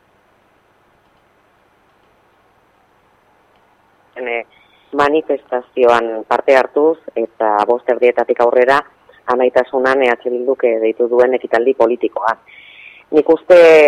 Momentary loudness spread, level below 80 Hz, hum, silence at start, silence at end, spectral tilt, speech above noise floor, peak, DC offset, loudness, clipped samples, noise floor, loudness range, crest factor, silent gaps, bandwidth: 10 LU; -58 dBFS; 50 Hz at -70 dBFS; 4.15 s; 0 s; -5 dB/octave; 42 dB; 0 dBFS; under 0.1%; -14 LUFS; under 0.1%; -55 dBFS; 8 LU; 16 dB; none; 9.8 kHz